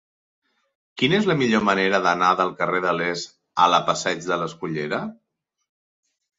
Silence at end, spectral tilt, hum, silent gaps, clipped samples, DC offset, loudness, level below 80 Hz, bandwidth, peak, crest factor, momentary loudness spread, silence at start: 1.25 s; -4.5 dB/octave; none; none; under 0.1%; under 0.1%; -21 LUFS; -62 dBFS; 7.8 kHz; -2 dBFS; 22 dB; 10 LU; 0.95 s